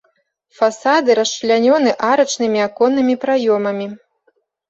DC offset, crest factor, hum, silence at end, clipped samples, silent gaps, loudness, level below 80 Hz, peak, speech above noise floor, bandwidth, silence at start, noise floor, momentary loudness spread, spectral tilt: under 0.1%; 14 dB; none; 0.75 s; under 0.1%; none; -16 LUFS; -64 dBFS; -2 dBFS; 48 dB; 8 kHz; 0.6 s; -63 dBFS; 5 LU; -3.5 dB/octave